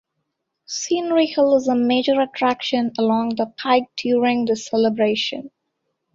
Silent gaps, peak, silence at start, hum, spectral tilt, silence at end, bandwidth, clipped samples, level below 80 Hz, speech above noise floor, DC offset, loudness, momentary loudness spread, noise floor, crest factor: none; -4 dBFS; 0.7 s; none; -4 dB/octave; 0.65 s; 7.8 kHz; under 0.1%; -64 dBFS; 57 dB; under 0.1%; -20 LUFS; 7 LU; -76 dBFS; 16 dB